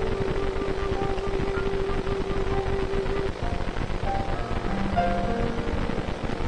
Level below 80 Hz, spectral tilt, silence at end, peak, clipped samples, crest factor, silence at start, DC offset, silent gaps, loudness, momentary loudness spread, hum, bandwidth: -30 dBFS; -7 dB/octave; 0 s; -10 dBFS; under 0.1%; 14 dB; 0 s; under 0.1%; none; -28 LUFS; 4 LU; none; 9.8 kHz